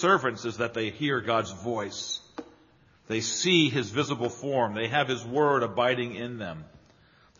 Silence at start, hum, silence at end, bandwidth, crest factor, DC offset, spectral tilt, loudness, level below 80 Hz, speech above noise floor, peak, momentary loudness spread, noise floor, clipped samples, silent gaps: 0 s; none; 0.65 s; 7.4 kHz; 20 dB; under 0.1%; -3 dB/octave; -27 LUFS; -66 dBFS; 33 dB; -10 dBFS; 13 LU; -60 dBFS; under 0.1%; none